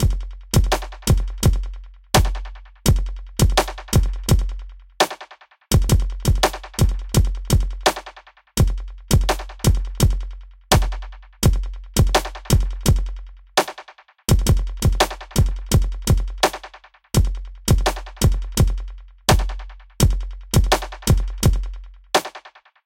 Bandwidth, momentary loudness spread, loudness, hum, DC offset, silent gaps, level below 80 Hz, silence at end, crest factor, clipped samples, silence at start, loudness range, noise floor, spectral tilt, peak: 17 kHz; 14 LU; -21 LUFS; none; 0.2%; none; -22 dBFS; 0.35 s; 20 dB; under 0.1%; 0 s; 1 LU; -44 dBFS; -4.5 dB/octave; 0 dBFS